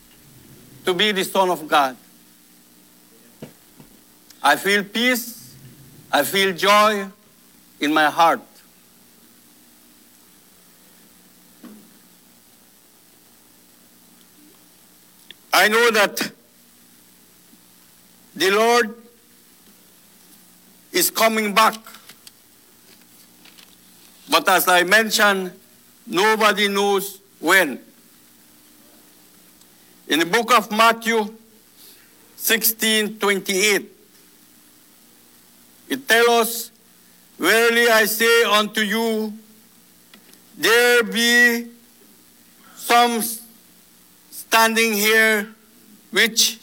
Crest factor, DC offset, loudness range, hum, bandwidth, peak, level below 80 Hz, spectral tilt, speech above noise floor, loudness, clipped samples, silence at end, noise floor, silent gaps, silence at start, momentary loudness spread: 20 dB; under 0.1%; 6 LU; none; 18.5 kHz; -2 dBFS; -72 dBFS; -2 dB/octave; 35 dB; -17 LUFS; under 0.1%; 0.05 s; -52 dBFS; none; 0.85 s; 13 LU